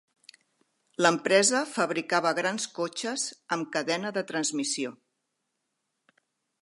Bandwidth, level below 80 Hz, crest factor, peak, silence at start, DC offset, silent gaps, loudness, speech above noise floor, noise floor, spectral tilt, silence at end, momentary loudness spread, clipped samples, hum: 11.5 kHz; -82 dBFS; 24 dB; -6 dBFS; 1 s; under 0.1%; none; -27 LUFS; 53 dB; -81 dBFS; -2.5 dB/octave; 1.65 s; 10 LU; under 0.1%; none